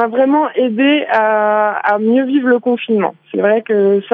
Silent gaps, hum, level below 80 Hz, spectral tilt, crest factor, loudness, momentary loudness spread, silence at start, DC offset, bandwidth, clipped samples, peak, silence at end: none; none; -74 dBFS; -8.5 dB/octave; 12 dB; -14 LUFS; 3 LU; 0 s; under 0.1%; 4.8 kHz; under 0.1%; -2 dBFS; 0 s